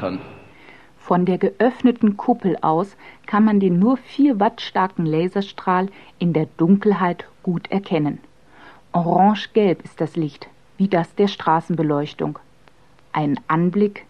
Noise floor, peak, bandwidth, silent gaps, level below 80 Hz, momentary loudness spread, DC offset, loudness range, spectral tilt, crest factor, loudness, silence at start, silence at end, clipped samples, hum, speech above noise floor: -54 dBFS; -2 dBFS; 6.8 kHz; none; -60 dBFS; 10 LU; 0.3%; 3 LU; -8.5 dB/octave; 18 dB; -20 LUFS; 0 s; 0.05 s; under 0.1%; none; 35 dB